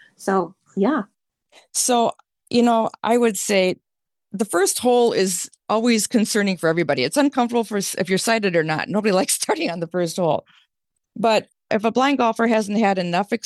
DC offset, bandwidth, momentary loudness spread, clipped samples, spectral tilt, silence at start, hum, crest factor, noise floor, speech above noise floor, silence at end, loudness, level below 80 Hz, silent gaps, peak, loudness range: under 0.1%; 13 kHz; 6 LU; under 0.1%; -4 dB/octave; 0.2 s; none; 14 dB; -78 dBFS; 58 dB; 0.05 s; -20 LUFS; -70 dBFS; none; -6 dBFS; 2 LU